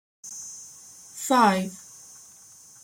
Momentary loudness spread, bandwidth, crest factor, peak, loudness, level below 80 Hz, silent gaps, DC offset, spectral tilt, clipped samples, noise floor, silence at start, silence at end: 26 LU; 16.5 kHz; 22 dB; -6 dBFS; -24 LUFS; -72 dBFS; none; under 0.1%; -4 dB/octave; under 0.1%; -50 dBFS; 0.25 s; 1.05 s